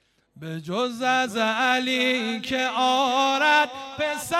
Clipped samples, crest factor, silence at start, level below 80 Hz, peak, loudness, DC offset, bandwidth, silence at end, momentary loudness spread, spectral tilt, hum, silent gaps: under 0.1%; 18 dB; 0.35 s; -66 dBFS; -6 dBFS; -22 LUFS; under 0.1%; 16 kHz; 0 s; 10 LU; -3 dB/octave; none; none